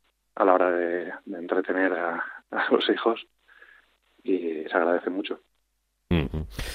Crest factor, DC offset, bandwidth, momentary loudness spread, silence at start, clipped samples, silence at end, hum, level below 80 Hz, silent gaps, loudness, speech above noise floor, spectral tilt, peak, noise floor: 24 dB; under 0.1%; 15.5 kHz; 13 LU; 0.35 s; under 0.1%; 0 s; none; -46 dBFS; none; -26 LUFS; 48 dB; -6.5 dB/octave; -4 dBFS; -74 dBFS